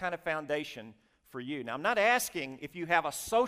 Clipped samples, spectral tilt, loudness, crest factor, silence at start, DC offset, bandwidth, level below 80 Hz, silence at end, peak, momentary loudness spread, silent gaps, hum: under 0.1%; -3 dB/octave; -31 LUFS; 20 dB; 0 s; under 0.1%; 16 kHz; -66 dBFS; 0 s; -12 dBFS; 16 LU; none; none